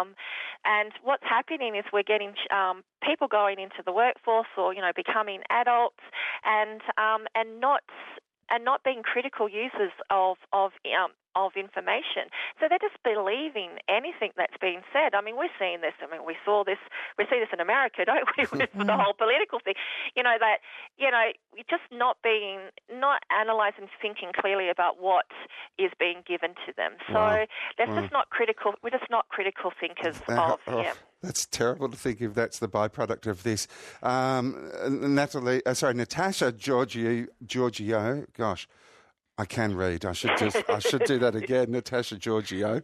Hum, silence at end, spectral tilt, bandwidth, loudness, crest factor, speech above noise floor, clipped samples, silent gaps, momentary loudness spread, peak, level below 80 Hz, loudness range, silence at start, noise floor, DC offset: none; 0 s; -4 dB/octave; 13.5 kHz; -27 LUFS; 16 dB; 33 dB; under 0.1%; none; 8 LU; -12 dBFS; -68 dBFS; 4 LU; 0 s; -61 dBFS; under 0.1%